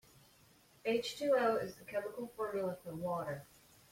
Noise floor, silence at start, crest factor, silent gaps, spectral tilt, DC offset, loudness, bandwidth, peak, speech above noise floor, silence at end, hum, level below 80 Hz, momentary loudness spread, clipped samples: -66 dBFS; 0.85 s; 18 dB; none; -5 dB/octave; under 0.1%; -38 LUFS; 16.5 kHz; -22 dBFS; 29 dB; 0.5 s; none; -74 dBFS; 11 LU; under 0.1%